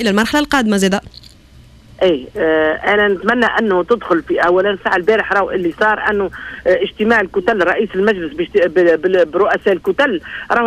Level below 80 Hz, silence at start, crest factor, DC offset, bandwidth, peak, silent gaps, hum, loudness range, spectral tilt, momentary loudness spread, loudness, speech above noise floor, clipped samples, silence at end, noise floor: -44 dBFS; 0 s; 14 dB; 0.1%; 14.5 kHz; 0 dBFS; none; none; 2 LU; -5 dB/octave; 4 LU; -15 LUFS; 28 dB; under 0.1%; 0 s; -43 dBFS